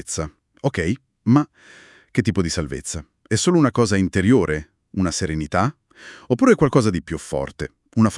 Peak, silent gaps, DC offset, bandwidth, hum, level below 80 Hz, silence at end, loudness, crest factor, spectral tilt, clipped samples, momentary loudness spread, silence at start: -2 dBFS; none; under 0.1%; 12 kHz; none; -44 dBFS; 0 s; -21 LUFS; 18 dB; -5.5 dB/octave; under 0.1%; 12 LU; 0.05 s